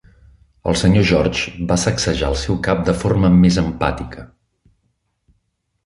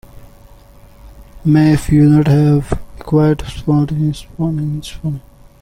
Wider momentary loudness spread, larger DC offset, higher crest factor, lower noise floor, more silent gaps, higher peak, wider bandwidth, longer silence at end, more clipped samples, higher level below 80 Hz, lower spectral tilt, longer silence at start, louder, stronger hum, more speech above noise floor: second, 10 LU vs 14 LU; neither; about the same, 16 dB vs 14 dB; first, -69 dBFS vs -41 dBFS; neither; about the same, -2 dBFS vs -2 dBFS; second, 11.5 kHz vs 13.5 kHz; first, 1.6 s vs 0.4 s; neither; about the same, -32 dBFS vs -32 dBFS; second, -5.5 dB/octave vs -8 dB/octave; first, 0.65 s vs 0.15 s; about the same, -17 LUFS vs -15 LUFS; neither; first, 53 dB vs 28 dB